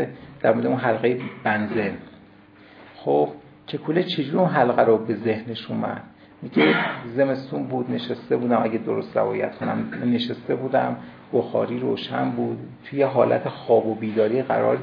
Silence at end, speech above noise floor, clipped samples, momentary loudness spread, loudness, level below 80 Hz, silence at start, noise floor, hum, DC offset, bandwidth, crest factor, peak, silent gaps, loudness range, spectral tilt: 0 s; 27 dB; under 0.1%; 10 LU; -23 LUFS; -66 dBFS; 0 s; -49 dBFS; none; under 0.1%; 5.2 kHz; 20 dB; -4 dBFS; none; 3 LU; -9 dB/octave